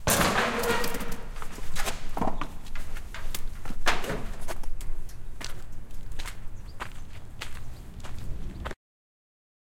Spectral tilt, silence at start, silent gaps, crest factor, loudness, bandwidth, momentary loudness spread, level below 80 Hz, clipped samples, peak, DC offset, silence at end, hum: -3 dB/octave; 0 s; none; 20 dB; -33 LUFS; 17 kHz; 18 LU; -34 dBFS; under 0.1%; -6 dBFS; under 0.1%; 1 s; none